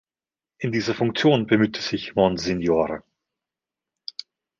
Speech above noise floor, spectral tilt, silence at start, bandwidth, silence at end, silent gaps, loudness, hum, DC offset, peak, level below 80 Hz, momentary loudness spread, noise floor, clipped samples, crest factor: over 68 dB; -6 dB/octave; 0.6 s; 7.4 kHz; 1.6 s; none; -22 LUFS; none; under 0.1%; -4 dBFS; -52 dBFS; 17 LU; under -90 dBFS; under 0.1%; 20 dB